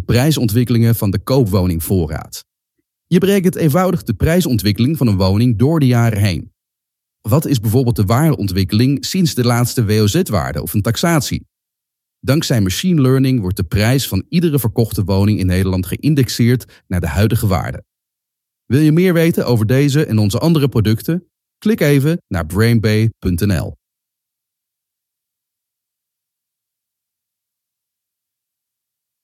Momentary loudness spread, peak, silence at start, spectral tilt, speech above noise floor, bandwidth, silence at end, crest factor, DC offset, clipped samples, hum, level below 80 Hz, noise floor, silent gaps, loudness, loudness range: 7 LU; 0 dBFS; 0 s; -6.5 dB/octave; 67 dB; 16 kHz; 5.5 s; 14 dB; under 0.1%; under 0.1%; none; -40 dBFS; -81 dBFS; none; -15 LUFS; 3 LU